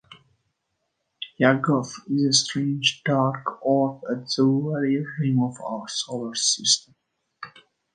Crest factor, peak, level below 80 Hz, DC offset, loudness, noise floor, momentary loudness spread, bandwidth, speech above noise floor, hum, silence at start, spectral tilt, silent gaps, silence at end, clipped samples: 22 dB; -2 dBFS; -70 dBFS; under 0.1%; -23 LUFS; -77 dBFS; 13 LU; 10 kHz; 54 dB; none; 0.1 s; -4 dB/octave; none; 0.45 s; under 0.1%